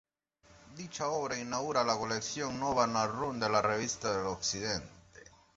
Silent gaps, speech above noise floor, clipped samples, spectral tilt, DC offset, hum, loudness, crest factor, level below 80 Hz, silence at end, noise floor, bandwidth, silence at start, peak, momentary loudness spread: none; 32 dB; under 0.1%; -3 dB/octave; under 0.1%; none; -33 LUFS; 22 dB; -62 dBFS; 0.35 s; -65 dBFS; 8 kHz; 0.5 s; -12 dBFS; 8 LU